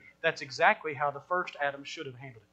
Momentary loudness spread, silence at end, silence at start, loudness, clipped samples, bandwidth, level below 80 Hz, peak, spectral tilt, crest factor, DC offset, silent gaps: 15 LU; 0.15 s; 0.05 s; -30 LUFS; under 0.1%; 8.6 kHz; -76 dBFS; -10 dBFS; -4 dB/octave; 22 dB; under 0.1%; none